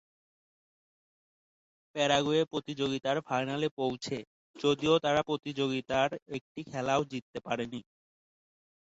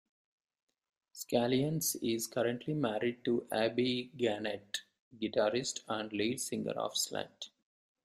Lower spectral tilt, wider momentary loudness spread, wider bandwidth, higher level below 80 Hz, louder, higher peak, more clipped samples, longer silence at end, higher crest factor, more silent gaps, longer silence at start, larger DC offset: about the same, -5 dB/octave vs -4 dB/octave; first, 13 LU vs 10 LU; second, 8 kHz vs 15.5 kHz; first, -68 dBFS vs -74 dBFS; first, -31 LUFS vs -35 LUFS; first, -12 dBFS vs -16 dBFS; neither; first, 1.1 s vs 0.6 s; about the same, 20 dB vs 20 dB; first, 3.71-3.77 s, 4.27-4.54 s, 6.22-6.26 s, 6.41-6.55 s, 7.22-7.34 s vs 4.99-5.11 s; first, 1.95 s vs 1.15 s; neither